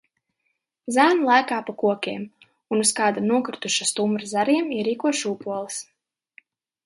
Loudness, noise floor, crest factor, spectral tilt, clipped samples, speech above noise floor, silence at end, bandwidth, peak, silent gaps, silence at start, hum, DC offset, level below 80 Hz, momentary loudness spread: -22 LUFS; -76 dBFS; 20 dB; -3 dB/octave; under 0.1%; 54 dB; 1.05 s; 11.5 kHz; -4 dBFS; none; 0.85 s; none; under 0.1%; -74 dBFS; 12 LU